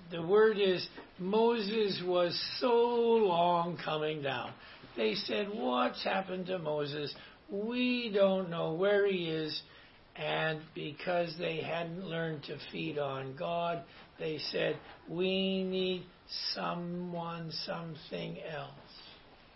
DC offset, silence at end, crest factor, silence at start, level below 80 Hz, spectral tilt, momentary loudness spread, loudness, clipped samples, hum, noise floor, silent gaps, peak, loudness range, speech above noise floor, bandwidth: under 0.1%; 0.2 s; 18 dB; 0 s; -68 dBFS; -8.5 dB/octave; 14 LU; -33 LUFS; under 0.1%; none; -56 dBFS; none; -16 dBFS; 7 LU; 23 dB; 5.8 kHz